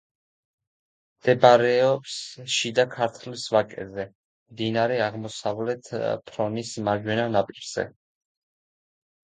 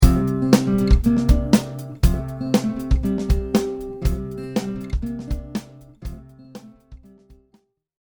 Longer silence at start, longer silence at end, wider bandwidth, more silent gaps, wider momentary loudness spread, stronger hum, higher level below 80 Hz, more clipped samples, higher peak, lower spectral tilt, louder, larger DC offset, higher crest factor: first, 1.25 s vs 0 s; first, 1.5 s vs 1.1 s; second, 9.4 kHz vs over 20 kHz; first, 4.15-4.46 s vs none; second, 15 LU vs 20 LU; neither; second, -64 dBFS vs -24 dBFS; neither; about the same, 0 dBFS vs 0 dBFS; second, -4.5 dB/octave vs -7 dB/octave; about the same, -24 LUFS vs -22 LUFS; neither; first, 26 dB vs 20 dB